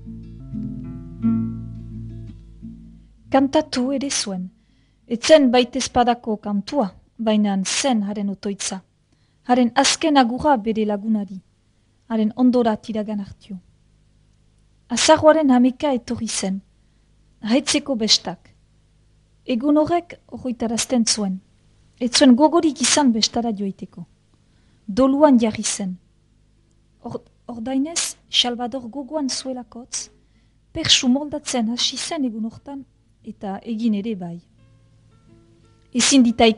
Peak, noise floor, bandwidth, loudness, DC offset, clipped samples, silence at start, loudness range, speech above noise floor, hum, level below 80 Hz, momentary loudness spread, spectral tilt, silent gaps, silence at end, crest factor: 0 dBFS; -60 dBFS; 11 kHz; -19 LUFS; under 0.1%; under 0.1%; 0 s; 6 LU; 41 dB; none; -50 dBFS; 21 LU; -3.5 dB/octave; none; 0 s; 22 dB